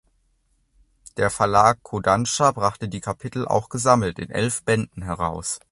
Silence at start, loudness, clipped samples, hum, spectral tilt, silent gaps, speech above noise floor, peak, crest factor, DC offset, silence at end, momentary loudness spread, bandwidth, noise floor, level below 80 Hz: 1.15 s; -22 LUFS; under 0.1%; none; -4.5 dB/octave; none; 44 dB; -2 dBFS; 22 dB; under 0.1%; 0.15 s; 11 LU; 11.5 kHz; -66 dBFS; -46 dBFS